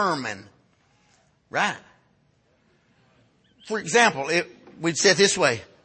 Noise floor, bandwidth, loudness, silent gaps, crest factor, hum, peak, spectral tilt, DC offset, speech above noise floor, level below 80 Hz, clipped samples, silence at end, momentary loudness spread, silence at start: -64 dBFS; 8.8 kHz; -22 LUFS; none; 22 dB; none; -4 dBFS; -2.5 dB/octave; under 0.1%; 42 dB; -68 dBFS; under 0.1%; 0.2 s; 16 LU; 0 s